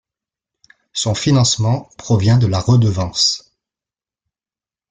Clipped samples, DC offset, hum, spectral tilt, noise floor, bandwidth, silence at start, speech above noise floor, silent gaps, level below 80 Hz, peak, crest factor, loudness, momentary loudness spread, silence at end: under 0.1%; under 0.1%; none; -5 dB/octave; under -90 dBFS; 9.4 kHz; 0.95 s; over 75 dB; none; -46 dBFS; -2 dBFS; 16 dB; -16 LUFS; 8 LU; 1.5 s